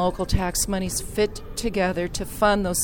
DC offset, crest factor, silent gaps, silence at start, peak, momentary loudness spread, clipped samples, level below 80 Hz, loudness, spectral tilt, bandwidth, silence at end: under 0.1%; 18 dB; none; 0 s; -6 dBFS; 7 LU; under 0.1%; -34 dBFS; -24 LUFS; -4 dB/octave; 20 kHz; 0 s